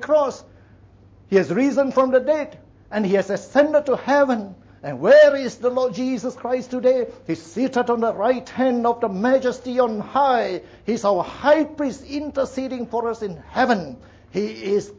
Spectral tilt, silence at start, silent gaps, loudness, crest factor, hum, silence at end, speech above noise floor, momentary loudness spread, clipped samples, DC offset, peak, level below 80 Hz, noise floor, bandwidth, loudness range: -6 dB/octave; 0 s; none; -20 LUFS; 16 dB; none; 0.05 s; 29 dB; 10 LU; under 0.1%; under 0.1%; -6 dBFS; -56 dBFS; -49 dBFS; 8 kHz; 4 LU